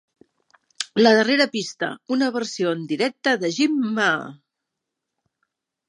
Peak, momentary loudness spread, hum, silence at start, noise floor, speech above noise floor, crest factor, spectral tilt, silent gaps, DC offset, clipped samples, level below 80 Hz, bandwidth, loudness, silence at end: -2 dBFS; 11 LU; none; 0.8 s; -82 dBFS; 62 dB; 20 dB; -4 dB/octave; none; under 0.1%; under 0.1%; -76 dBFS; 11 kHz; -21 LUFS; 1.55 s